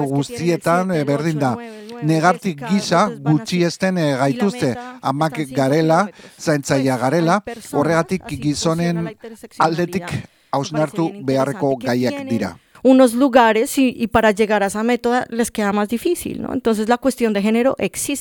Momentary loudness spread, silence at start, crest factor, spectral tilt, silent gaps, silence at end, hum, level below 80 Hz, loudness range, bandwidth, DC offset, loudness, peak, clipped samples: 9 LU; 0 s; 18 dB; -5.5 dB/octave; none; 0 s; none; -52 dBFS; 5 LU; 19 kHz; under 0.1%; -18 LUFS; 0 dBFS; under 0.1%